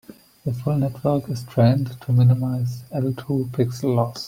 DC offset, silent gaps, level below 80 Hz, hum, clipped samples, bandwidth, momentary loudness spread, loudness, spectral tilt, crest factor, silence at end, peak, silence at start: under 0.1%; none; -56 dBFS; none; under 0.1%; 15.5 kHz; 9 LU; -22 LUFS; -8.5 dB/octave; 16 dB; 0 s; -4 dBFS; 0.1 s